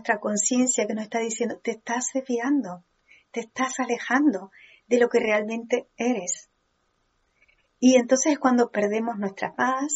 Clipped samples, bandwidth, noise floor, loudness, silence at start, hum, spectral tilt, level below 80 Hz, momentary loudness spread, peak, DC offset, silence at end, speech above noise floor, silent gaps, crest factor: under 0.1%; 8.2 kHz; -71 dBFS; -24 LUFS; 0.05 s; none; -3 dB/octave; -74 dBFS; 10 LU; -6 dBFS; under 0.1%; 0 s; 47 dB; none; 18 dB